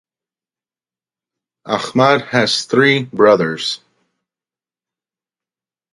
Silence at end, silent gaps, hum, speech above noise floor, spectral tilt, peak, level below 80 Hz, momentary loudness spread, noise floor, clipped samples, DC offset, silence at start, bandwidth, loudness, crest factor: 2.15 s; none; none; over 76 dB; -4.5 dB/octave; 0 dBFS; -64 dBFS; 10 LU; under -90 dBFS; under 0.1%; under 0.1%; 1.65 s; 11.5 kHz; -14 LUFS; 18 dB